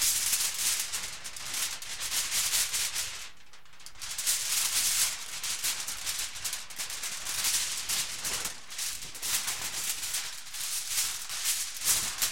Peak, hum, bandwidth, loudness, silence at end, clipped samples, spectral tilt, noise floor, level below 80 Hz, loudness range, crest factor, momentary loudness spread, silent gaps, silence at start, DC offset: -12 dBFS; none; 16.5 kHz; -29 LUFS; 0 s; under 0.1%; 2 dB/octave; -56 dBFS; -60 dBFS; 3 LU; 22 dB; 10 LU; none; 0 s; 0.7%